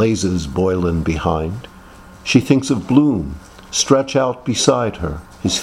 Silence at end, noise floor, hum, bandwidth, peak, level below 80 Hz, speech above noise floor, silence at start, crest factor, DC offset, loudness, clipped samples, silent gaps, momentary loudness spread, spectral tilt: 0 s; -40 dBFS; none; 13.5 kHz; 0 dBFS; -36 dBFS; 24 dB; 0 s; 18 dB; under 0.1%; -17 LUFS; under 0.1%; none; 12 LU; -5 dB/octave